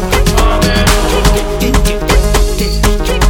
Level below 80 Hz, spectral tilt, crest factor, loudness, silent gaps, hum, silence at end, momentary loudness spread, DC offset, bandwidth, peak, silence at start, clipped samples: -12 dBFS; -4.5 dB/octave; 10 dB; -12 LUFS; none; none; 0 s; 3 LU; under 0.1%; 17.5 kHz; 0 dBFS; 0 s; under 0.1%